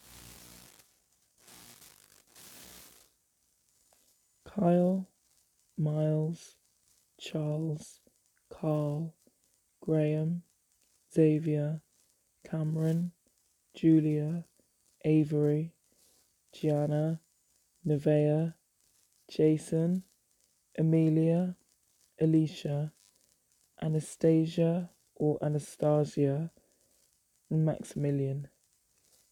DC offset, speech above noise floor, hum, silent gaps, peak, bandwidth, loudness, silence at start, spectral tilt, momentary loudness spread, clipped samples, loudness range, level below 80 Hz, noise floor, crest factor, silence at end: under 0.1%; 45 dB; none; none; -14 dBFS; 14.5 kHz; -31 LUFS; 0.15 s; -8.5 dB/octave; 20 LU; under 0.1%; 5 LU; -70 dBFS; -74 dBFS; 18 dB; 0.85 s